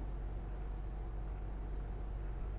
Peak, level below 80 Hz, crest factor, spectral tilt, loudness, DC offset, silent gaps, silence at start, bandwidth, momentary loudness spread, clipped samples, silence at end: -32 dBFS; -42 dBFS; 8 dB; -8.5 dB/octave; -45 LUFS; under 0.1%; none; 0 s; 4 kHz; 1 LU; under 0.1%; 0 s